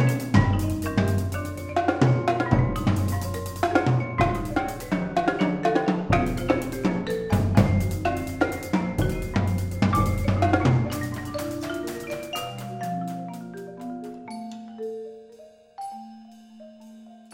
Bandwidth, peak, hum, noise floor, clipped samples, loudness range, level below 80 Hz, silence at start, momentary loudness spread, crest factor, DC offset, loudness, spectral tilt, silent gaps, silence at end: 16.5 kHz; -6 dBFS; none; -49 dBFS; under 0.1%; 12 LU; -40 dBFS; 0 s; 16 LU; 20 dB; under 0.1%; -25 LUFS; -7 dB/octave; none; 0.1 s